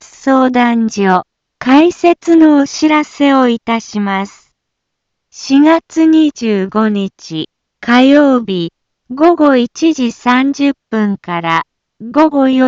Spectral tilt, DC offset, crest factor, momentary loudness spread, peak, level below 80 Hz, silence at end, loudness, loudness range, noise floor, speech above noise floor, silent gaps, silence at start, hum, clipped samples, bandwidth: -5.5 dB/octave; under 0.1%; 12 dB; 13 LU; 0 dBFS; -56 dBFS; 0 s; -11 LUFS; 3 LU; -73 dBFS; 63 dB; none; 0.25 s; none; under 0.1%; 7.6 kHz